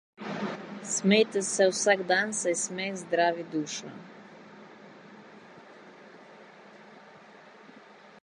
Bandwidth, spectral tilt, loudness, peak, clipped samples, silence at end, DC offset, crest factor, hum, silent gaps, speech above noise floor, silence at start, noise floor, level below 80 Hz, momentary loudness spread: 11.5 kHz; -3 dB/octave; -27 LUFS; -8 dBFS; under 0.1%; 0.15 s; under 0.1%; 22 dB; none; none; 25 dB; 0.2 s; -52 dBFS; -82 dBFS; 27 LU